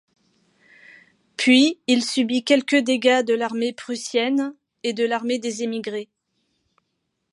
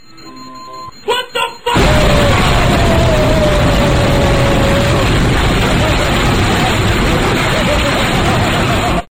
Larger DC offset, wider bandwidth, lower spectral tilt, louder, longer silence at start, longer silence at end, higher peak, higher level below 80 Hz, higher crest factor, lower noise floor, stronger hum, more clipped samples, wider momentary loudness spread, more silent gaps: second, under 0.1% vs 0.8%; second, 11.5 kHz vs 16.5 kHz; second, -3 dB/octave vs -5 dB/octave; second, -21 LUFS vs -12 LUFS; first, 1.4 s vs 0.2 s; first, 1.3 s vs 0.05 s; about the same, -4 dBFS vs -2 dBFS; second, -78 dBFS vs -18 dBFS; first, 20 dB vs 10 dB; first, -75 dBFS vs -33 dBFS; neither; neither; first, 13 LU vs 7 LU; neither